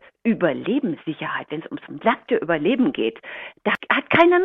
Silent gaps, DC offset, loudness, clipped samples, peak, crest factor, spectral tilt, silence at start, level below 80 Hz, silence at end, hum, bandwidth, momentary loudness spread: none; under 0.1%; -22 LUFS; under 0.1%; -2 dBFS; 20 dB; -7.5 dB/octave; 0.25 s; -62 dBFS; 0 s; none; 5.2 kHz; 13 LU